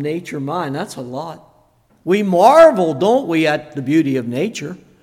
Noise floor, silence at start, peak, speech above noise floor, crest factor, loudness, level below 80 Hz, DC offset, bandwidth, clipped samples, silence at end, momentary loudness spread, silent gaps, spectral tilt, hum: -55 dBFS; 0 s; 0 dBFS; 40 dB; 16 dB; -15 LUFS; -60 dBFS; under 0.1%; 15.5 kHz; under 0.1%; 0.25 s; 19 LU; none; -6 dB/octave; none